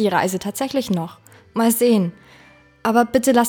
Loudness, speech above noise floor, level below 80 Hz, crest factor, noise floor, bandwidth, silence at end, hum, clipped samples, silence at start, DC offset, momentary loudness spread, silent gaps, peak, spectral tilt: -20 LUFS; 31 dB; -56 dBFS; 16 dB; -49 dBFS; over 20 kHz; 0 s; none; under 0.1%; 0 s; under 0.1%; 10 LU; none; -2 dBFS; -5 dB/octave